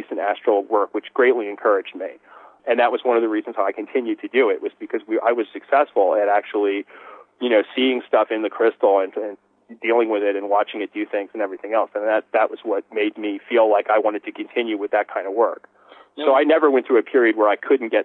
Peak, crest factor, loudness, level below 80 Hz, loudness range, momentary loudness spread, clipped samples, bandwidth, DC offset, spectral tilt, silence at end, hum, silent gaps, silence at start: -6 dBFS; 14 dB; -20 LUFS; -86 dBFS; 2 LU; 10 LU; under 0.1%; 4.1 kHz; under 0.1%; -6.5 dB/octave; 0 s; none; none; 0 s